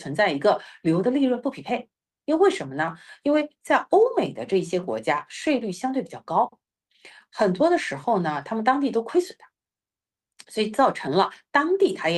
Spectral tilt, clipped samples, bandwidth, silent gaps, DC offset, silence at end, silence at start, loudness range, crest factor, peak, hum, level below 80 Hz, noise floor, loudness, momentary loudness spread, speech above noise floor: -5.5 dB/octave; under 0.1%; 12 kHz; none; under 0.1%; 0 s; 0 s; 2 LU; 18 dB; -6 dBFS; none; -68 dBFS; under -90 dBFS; -24 LUFS; 8 LU; over 67 dB